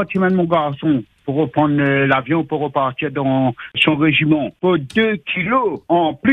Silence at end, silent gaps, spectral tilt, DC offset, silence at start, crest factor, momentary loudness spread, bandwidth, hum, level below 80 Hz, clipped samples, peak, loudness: 0 s; none; -8 dB/octave; under 0.1%; 0 s; 16 dB; 6 LU; 9.4 kHz; none; -54 dBFS; under 0.1%; 0 dBFS; -17 LUFS